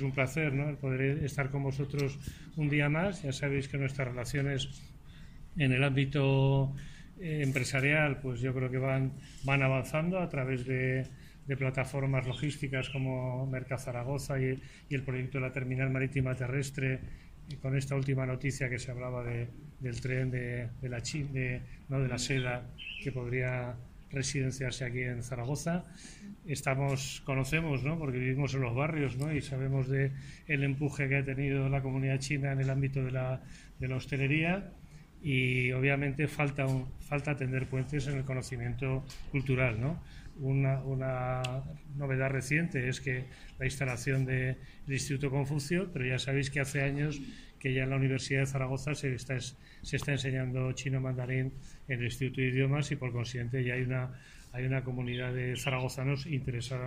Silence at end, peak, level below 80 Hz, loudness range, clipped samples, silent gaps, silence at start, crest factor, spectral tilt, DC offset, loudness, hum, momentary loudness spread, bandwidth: 0 s; -14 dBFS; -52 dBFS; 4 LU; under 0.1%; none; 0 s; 18 dB; -6 dB/octave; under 0.1%; -33 LUFS; none; 10 LU; 15 kHz